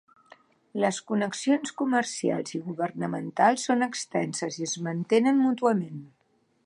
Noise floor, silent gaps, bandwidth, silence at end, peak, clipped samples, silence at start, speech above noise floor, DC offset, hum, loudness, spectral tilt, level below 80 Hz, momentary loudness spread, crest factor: -69 dBFS; none; 11 kHz; 0.6 s; -8 dBFS; under 0.1%; 0.75 s; 43 dB; under 0.1%; none; -27 LUFS; -4.5 dB/octave; -78 dBFS; 9 LU; 20 dB